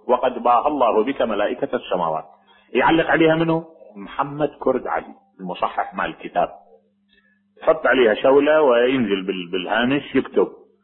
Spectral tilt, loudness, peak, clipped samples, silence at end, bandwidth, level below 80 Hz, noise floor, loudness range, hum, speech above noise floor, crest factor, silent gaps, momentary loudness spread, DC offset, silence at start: -9.5 dB/octave; -20 LUFS; -4 dBFS; under 0.1%; 0.3 s; 4.2 kHz; -54 dBFS; -60 dBFS; 7 LU; none; 41 dB; 16 dB; none; 11 LU; under 0.1%; 0.05 s